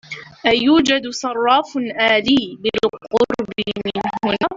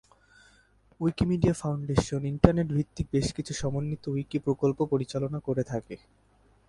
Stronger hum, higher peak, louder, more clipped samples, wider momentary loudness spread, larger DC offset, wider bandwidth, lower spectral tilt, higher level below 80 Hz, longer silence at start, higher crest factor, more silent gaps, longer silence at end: neither; about the same, -2 dBFS vs -2 dBFS; first, -18 LUFS vs -29 LUFS; neither; about the same, 9 LU vs 9 LU; neither; second, 7.8 kHz vs 11.5 kHz; second, -4 dB/octave vs -7 dB/octave; second, -52 dBFS vs -44 dBFS; second, 0.1 s vs 1 s; second, 16 dB vs 28 dB; neither; second, 0 s vs 0.7 s